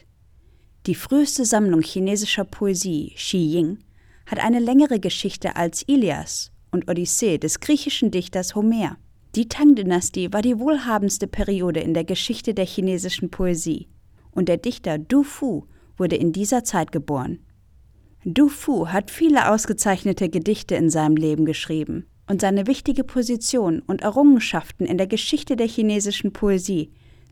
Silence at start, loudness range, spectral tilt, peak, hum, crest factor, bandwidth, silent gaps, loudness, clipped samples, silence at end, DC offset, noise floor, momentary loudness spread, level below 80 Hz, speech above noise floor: 0.85 s; 3 LU; -4.5 dB/octave; -4 dBFS; none; 18 dB; 16.5 kHz; none; -21 LUFS; under 0.1%; 0.45 s; under 0.1%; -53 dBFS; 10 LU; -44 dBFS; 33 dB